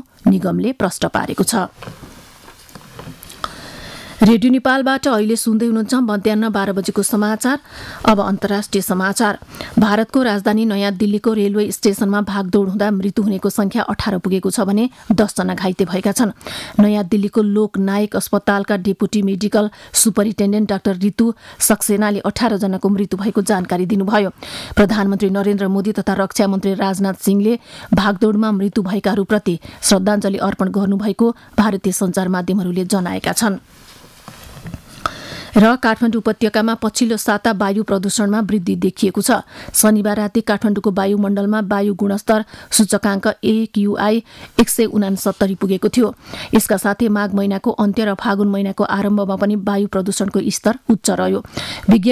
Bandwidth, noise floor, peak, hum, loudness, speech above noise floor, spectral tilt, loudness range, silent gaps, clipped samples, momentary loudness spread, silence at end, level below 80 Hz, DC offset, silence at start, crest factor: 15.5 kHz; -42 dBFS; -2 dBFS; none; -17 LUFS; 26 dB; -5 dB/octave; 2 LU; none; under 0.1%; 5 LU; 0 s; -44 dBFS; under 0.1%; 0.25 s; 14 dB